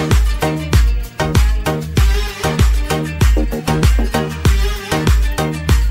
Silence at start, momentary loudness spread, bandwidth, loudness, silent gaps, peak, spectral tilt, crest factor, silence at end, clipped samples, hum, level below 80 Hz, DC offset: 0 s; 4 LU; 16.5 kHz; -16 LUFS; none; -2 dBFS; -5.5 dB/octave; 12 dB; 0 s; under 0.1%; none; -16 dBFS; under 0.1%